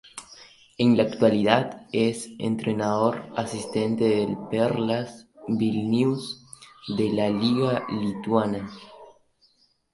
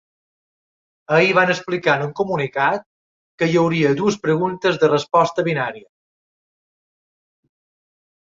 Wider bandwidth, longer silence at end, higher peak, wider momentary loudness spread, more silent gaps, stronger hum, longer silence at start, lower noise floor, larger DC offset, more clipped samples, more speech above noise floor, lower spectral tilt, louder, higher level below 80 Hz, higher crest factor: first, 11.5 kHz vs 7.8 kHz; second, 0.85 s vs 2.6 s; about the same, -4 dBFS vs -2 dBFS; first, 14 LU vs 7 LU; second, none vs 2.86-3.38 s; neither; second, 0.15 s vs 1.1 s; second, -64 dBFS vs under -90 dBFS; neither; neither; second, 40 dB vs over 72 dB; about the same, -6 dB/octave vs -6 dB/octave; second, -24 LUFS vs -18 LUFS; about the same, -62 dBFS vs -62 dBFS; about the same, 22 dB vs 18 dB